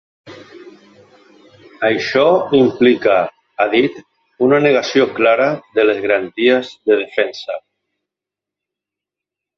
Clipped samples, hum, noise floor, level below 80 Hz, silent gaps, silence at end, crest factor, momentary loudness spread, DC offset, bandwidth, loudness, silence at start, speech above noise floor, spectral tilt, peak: under 0.1%; none; -85 dBFS; -60 dBFS; none; 2 s; 16 dB; 8 LU; under 0.1%; 7 kHz; -15 LUFS; 0.25 s; 71 dB; -5.5 dB/octave; 0 dBFS